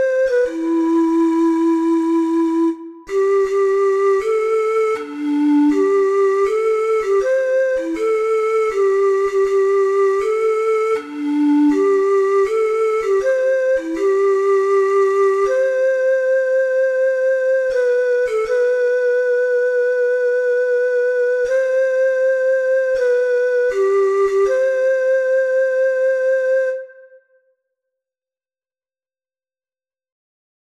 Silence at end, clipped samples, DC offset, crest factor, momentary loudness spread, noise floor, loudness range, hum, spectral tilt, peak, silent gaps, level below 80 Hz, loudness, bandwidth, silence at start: 3.75 s; under 0.1%; under 0.1%; 10 dB; 3 LU; under -90 dBFS; 1 LU; none; -4 dB/octave; -8 dBFS; none; -56 dBFS; -17 LUFS; 10 kHz; 0 s